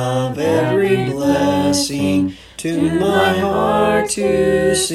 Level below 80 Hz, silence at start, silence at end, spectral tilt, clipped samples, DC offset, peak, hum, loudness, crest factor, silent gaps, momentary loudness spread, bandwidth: -42 dBFS; 0 s; 0 s; -4.5 dB/octave; under 0.1%; under 0.1%; -2 dBFS; none; -16 LUFS; 14 dB; none; 4 LU; 14.5 kHz